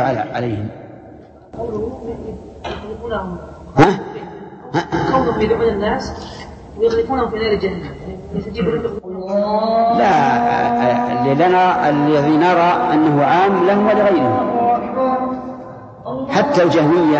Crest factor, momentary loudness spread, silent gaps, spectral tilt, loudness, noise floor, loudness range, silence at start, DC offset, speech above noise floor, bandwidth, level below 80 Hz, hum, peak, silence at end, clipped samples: 16 dB; 17 LU; none; -7 dB/octave; -16 LUFS; -40 dBFS; 7 LU; 0 s; under 0.1%; 24 dB; 8.2 kHz; -42 dBFS; none; 0 dBFS; 0 s; under 0.1%